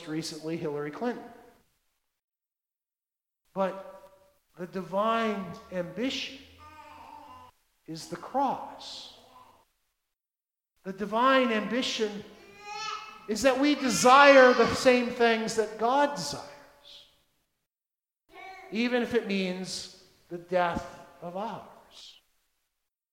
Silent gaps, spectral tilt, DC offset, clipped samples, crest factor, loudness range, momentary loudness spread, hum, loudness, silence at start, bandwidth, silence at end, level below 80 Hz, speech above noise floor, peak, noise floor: 2.24-2.28 s; -3.5 dB/octave; under 0.1%; under 0.1%; 24 dB; 16 LU; 21 LU; none; -26 LUFS; 0 s; 16 kHz; 1.05 s; -64 dBFS; over 64 dB; -4 dBFS; under -90 dBFS